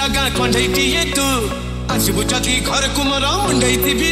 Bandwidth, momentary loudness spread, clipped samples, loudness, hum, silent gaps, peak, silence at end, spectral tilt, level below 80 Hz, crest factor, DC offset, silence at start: 16 kHz; 4 LU; under 0.1%; -16 LUFS; none; none; -2 dBFS; 0 s; -3 dB/octave; -28 dBFS; 14 dB; under 0.1%; 0 s